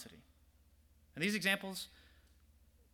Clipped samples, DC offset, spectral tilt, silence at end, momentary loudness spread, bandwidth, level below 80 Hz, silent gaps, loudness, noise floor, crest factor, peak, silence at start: under 0.1%; under 0.1%; -3.5 dB/octave; 1.05 s; 21 LU; 19.5 kHz; -68 dBFS; none; -36 LUFS; -68 dBFS; 24 dB; -18 dBFS; 0 s